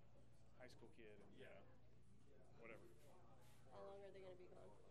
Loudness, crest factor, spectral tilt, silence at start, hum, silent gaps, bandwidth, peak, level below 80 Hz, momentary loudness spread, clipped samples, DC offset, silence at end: -64 LUFS; 18 dB; -6 dB/octave; 0 s; none; none; 13 kHz; -46 dBFS; -80 dBFS; 6 LU; under 0.1%; under 0.1%; 0 s